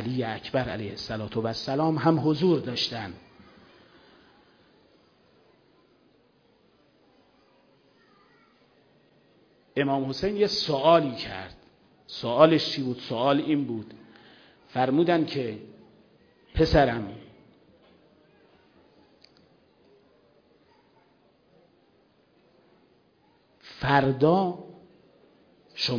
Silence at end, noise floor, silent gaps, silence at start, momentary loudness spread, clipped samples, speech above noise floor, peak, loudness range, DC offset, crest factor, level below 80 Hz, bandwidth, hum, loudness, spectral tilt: 0 s; -64 dBFS; none; 0 s; 19 LU; under 0.1%; 39 dB; -4 dBFS; 9 LU; under 0.1%; 24 dB; -50 dBFS; 5.4 kHz; none; -25 LUFS; -6.5 dB/octave